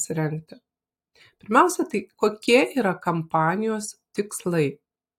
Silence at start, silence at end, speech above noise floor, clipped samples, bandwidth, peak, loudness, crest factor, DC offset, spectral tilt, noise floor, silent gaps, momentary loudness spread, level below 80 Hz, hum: 0 s; 0.45 s; 46 dB; under 0.1%; 16.5 kHz; -4 dBFS; -23 LUFS; 20 dB; under 0.1%; -5 dB/octave; -69 dBFS; none; 11 LU; -68 dBFS; none